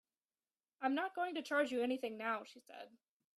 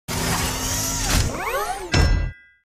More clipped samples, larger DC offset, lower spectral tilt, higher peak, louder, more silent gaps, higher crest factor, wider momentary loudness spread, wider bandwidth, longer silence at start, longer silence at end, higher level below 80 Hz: neither; neither; about the same, -3.5 dB/octave vs -3.5 dB/octave; second, -22 dBFS vs -6 dBFS; second, -39 LUFS vs -22 LUFS; neither; about the same, 18 dB vs 18 dB; first, 19 LU vs 6 LU; second, 13 kHz vs 15.5 kHz; first, 0.8 s vs 0.1 s; first, 0.5 s vs 0.3 s; second, -90 dBFS vs -26 dBFS